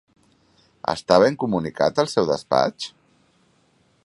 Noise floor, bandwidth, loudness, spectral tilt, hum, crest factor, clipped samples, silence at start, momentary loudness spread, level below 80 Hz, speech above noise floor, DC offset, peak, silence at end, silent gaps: -62 dBFS; 11.5 kHz; -21 LUFS; -5 dB/octave; none; 22 dB; under 0.1%; 0.85 s; 12 LU; -58 dBFS; 42 dB; under 0.1%; 0 dBFS; 1.15 s; none